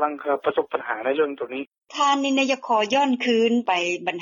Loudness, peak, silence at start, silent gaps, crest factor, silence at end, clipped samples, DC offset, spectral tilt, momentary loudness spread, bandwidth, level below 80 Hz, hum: -22 LUFS; -8 dBFS; 0 s; 1.78-1.82 s; 16 dB; 0 s; under 0.1%; under 0.1%; -3 dB/octave; 8 LU; 7.4 kHz; -74 dBFS; none